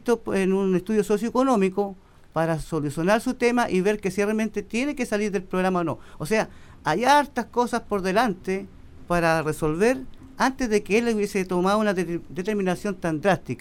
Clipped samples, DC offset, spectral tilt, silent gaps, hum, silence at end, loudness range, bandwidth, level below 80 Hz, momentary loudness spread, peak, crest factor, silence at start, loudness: under 0.1%; under 0.1%; -5.5 dB/octave; none; none; 0 s; 1 LU; 16 kHz; -46 dBFS; 8 LU; -6 dBFS; 18 dB; 0.05 s; -24 LUFS